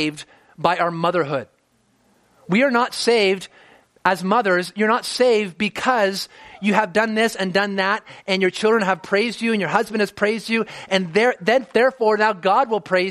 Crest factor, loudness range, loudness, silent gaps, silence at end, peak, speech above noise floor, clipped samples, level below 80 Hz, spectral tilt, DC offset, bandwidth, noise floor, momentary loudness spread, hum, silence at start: 20 dB; 2 LU; -19 LUFS; none; 0 s; 0 dBFS; 43 dB; under 0.1%; -64 dBFS; -4.5 dB/octave; under 0.1%; 14.5 kHz; -62 dBFS; 6 LU; none; 0 s